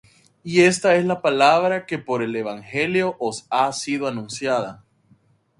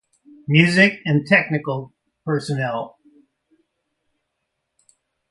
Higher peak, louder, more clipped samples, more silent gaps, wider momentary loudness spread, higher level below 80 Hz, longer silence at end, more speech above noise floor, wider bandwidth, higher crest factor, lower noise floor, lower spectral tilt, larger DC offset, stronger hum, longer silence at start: about the same, -2 dBFS vs 0 dBFS; about the same, -20 LUFS vs -18 LUFS; neither; neither; second, 11 LU vs 17 LU; about the same, -64 dBFS vs -62 dBFS; second, 0.85 s vs 2.4 s; second, 38 dB vs 58 dB; about the same, 11.5 kHz vs 11.5 kHz; about the same, 20 dB vs 22 dB; second, -59 dBFS vs -77 dBFS; second, -4.5 dB/octave vs -6 dB/octave; neither; neither; about the same, 0.45 s vs 0.5 s